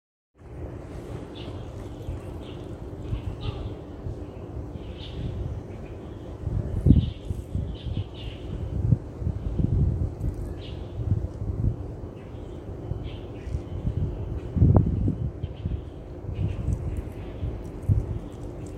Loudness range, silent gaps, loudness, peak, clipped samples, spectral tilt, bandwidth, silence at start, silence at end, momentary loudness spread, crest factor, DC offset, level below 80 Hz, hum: 9 LU; none; -30 LUFS; -2 dBFS; under 0.1%; -9 dB/octave; 9 kHz; 0.4 s; 0 s; 13 LU; 26 dB; under 0.1%; -34 dBFS; none